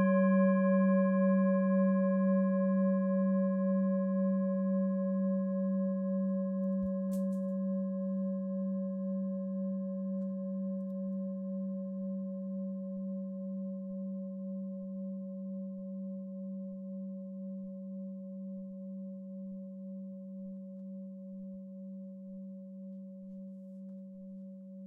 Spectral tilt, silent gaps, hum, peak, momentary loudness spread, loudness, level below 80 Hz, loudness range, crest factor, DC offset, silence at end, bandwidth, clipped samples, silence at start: -12 dB/octave; none; none; -18 dBFS; 18 LU; -34 LUFS; -78 dBFS; 16 LU; 16 dB; under 0.1%; 0 s; 2.5 kHz; under 0.1%; 0 s